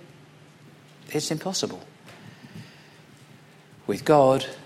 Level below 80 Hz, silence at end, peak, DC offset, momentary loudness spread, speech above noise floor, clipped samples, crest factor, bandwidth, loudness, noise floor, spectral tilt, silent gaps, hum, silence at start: -64 dBFS; 0 s; -4 dBFS; under 0.1%; 28 LU; 28 dB; under 0.1%; 22 dB; 15.5 kHz; -24 LUFS; -51 dBFS; -4.5 dB/octave; none; none; 1.1 s